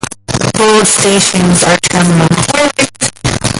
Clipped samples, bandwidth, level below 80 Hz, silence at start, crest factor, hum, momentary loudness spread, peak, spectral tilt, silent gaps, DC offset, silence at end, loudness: under 0.1%; 12 kHz; -34 dBFS; 0.05 s; 10 dB; none; 7 LU; 0 dBFS; -3.5 dB/octave; none; under 0.1%; 0 s; -9 LUFS